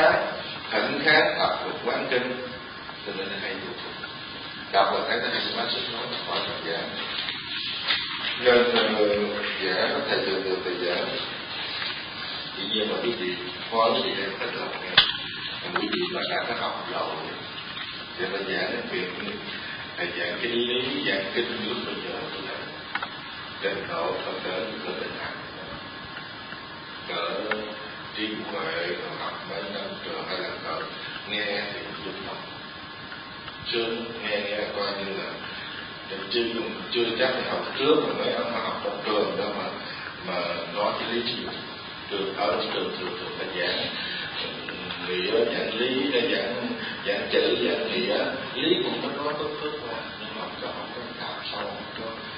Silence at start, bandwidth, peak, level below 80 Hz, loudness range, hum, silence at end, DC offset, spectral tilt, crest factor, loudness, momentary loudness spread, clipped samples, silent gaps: 0 s; 5.4 kHz; 0 dBFS; -60 dBFS; 7 LU; none; 0 s; under 0.1%; -8 dB/octave; 28 dB; -27 LUFS; 11 LU; under 0.1%; none